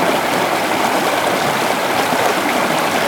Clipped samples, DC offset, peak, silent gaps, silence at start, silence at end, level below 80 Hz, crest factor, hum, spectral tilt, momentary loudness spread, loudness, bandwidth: under 0.1%; under 0.1%; -2 dBFS; none; 0 s; 0 s; -56 dBFS; 16 dB; none; -3 dB/octave; 1 LU; -16 LUFS; 18 kHz